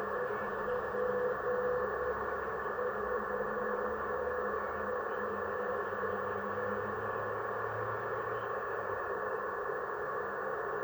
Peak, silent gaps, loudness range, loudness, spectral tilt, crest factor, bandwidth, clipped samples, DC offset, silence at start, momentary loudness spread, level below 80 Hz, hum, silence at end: -22 dBFS; none; 2 LU; -36 LUFS; -7 dB/octave; 14 dB; over 20 kHz; under 0.1%; under 0.1%; 0 s; 3 LU; -60 dBFS; none; 0 s